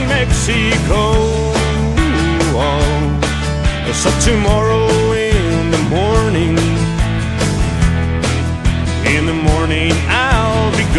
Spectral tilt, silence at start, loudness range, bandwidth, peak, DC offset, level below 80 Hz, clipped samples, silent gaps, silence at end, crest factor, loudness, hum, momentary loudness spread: -5 dB/octave; 0 s; 2 LU; 12.5 kHz; 0 dBFS; under 0.1%; -20 dBFS; under 0.1%; none; 0 s; 14 dB; -14 LUFS; none; 4 LU